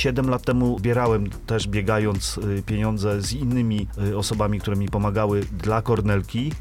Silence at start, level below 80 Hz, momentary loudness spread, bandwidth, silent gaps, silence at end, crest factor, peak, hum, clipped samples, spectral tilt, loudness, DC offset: 0 s; -36 dBFS; 4 LU; 15.5 kHz; none; 0 s; 14 dB; -8 dBFS; none; under 0.1%; -6 dB/octave; -23 LUFS; under 0.1%